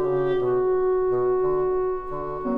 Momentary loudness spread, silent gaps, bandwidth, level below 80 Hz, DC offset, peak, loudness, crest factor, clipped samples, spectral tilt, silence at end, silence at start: 7 LU; none; 3.7 kHz; -44 dBFS; under 0.1%; -14 dBFS; -23 LUFS; 8 dB; under 0.1%; -10 dB/octave; 0 s; 0 s